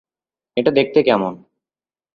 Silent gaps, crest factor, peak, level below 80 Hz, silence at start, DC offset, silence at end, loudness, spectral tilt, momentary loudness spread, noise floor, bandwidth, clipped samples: none; 18 dB; -2 dBFS; -60 dBFS; 0.55 s; under 0.1%; 0.8 s; -17 LUFS; -8 dB/octave; 11 LU; under -90 dBFS; 5.2 kHz; under 0.1%